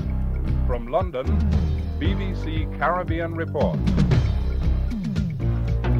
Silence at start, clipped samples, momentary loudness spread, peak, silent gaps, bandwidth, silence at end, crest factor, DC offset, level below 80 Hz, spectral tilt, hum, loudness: 0 s; under 0.1%; 5 LU; -6 dBFS; none; 7.2 kHz; 0 s; 16 dB; under 0.1%; -26 dBFS; -8.5 dB/octave; none; -24 LUFS